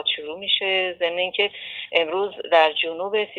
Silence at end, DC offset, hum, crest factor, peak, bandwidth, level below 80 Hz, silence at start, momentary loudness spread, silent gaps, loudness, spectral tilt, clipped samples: 0 s; under 0.1%; none; 20 dB; -4 dBFS; 7.2 kHz; -72 dBFS; 0 s; 7 LU; none; -22 LUFS; -4 dB/octave; under 0.1%